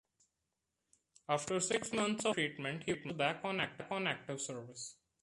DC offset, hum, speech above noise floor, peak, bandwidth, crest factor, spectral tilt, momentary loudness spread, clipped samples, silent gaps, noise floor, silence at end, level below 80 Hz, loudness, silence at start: under 0.1%; none; 50 dB; -18 dBFS; 11.5 kHz; 22 dB; -3.5 dB/octave; 11 LU; under 0.1%; none; -87 dBFS; 0.3 s; -74 dBFS; -37 LUFS; 1.3 s